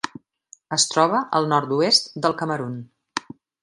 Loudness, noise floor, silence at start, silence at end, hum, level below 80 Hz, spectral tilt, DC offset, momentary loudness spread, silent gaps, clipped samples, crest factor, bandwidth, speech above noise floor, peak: -21 LUFS; -53 dBFS; 0.05 s; 0.45 s; none; -70 dBFS; -3 dB/octave; under 0.1%; 15 LU; none; under 0.1%; 22 dB; 11.5 kHz; 32 dB; -2 dBFS